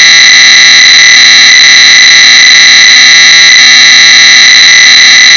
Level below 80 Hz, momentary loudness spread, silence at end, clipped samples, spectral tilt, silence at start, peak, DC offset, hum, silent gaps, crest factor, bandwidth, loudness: -46 dBFS; 0 LU; 0 s; 50%; 3 dB/octave; 0 s; 0 dBFS; 0.4%; none; none; 0 dB; 8 kHz; 3 LUFS